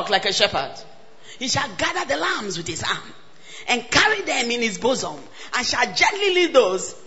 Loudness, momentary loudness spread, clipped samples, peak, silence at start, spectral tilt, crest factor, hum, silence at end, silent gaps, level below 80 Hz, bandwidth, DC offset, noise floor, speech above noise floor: -20 LUFS; 13 LU; under 0.1%; 0 dBFS; 0 s; -2 dB/octave; 22 dB; none; 0.1 s; none; -52 dBFS; 8.2 kHz; 0.9%; -46 dBFS; 24 dB